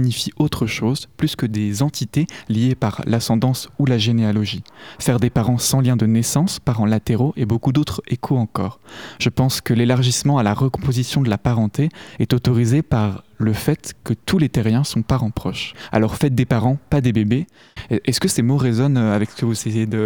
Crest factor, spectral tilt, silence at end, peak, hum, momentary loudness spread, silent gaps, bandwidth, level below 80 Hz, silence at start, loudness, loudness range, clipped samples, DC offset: 18 dB; -6 dB/octave; 0 s; 0 dBFS; none; 7 LU; none; 19 kHz; -42 dBFS; 0 s; -19 LUFS; 2 LU; under 0.1%; 0.3%